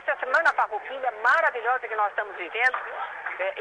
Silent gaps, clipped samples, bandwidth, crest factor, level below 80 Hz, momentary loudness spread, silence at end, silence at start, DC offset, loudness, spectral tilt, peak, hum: none; under 0.1%; 10.5 kHz; 14 dB; -72 dBFS; 10 LU; 0 s; 0 s; under 0.1%; -25 LUFS; -1.5 dB/octave; -12 dBFS; none